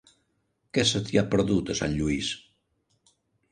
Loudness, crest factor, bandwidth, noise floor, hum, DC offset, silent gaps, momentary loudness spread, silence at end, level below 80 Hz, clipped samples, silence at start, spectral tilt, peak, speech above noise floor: -26 LUFS; 20 dB; 10.5 kHz; -74 dBFS; none; under 0.1%; none; 7 LU; 1.15 s; -48 dBFS; under 0.1%; 0.75 s; -4.5 dB/octave; -8 dBFS; 48 dB